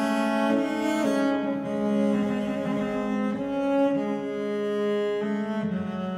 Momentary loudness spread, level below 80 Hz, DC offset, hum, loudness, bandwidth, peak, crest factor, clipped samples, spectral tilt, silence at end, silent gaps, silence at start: 5 LU; -62 dBFS; under 0.1%; none; -26 LUFS; 13.5 kHz; -12 dBFS; 14 dB; under 0.1%; -6.5 dB/octave; 0 s; none; 0 s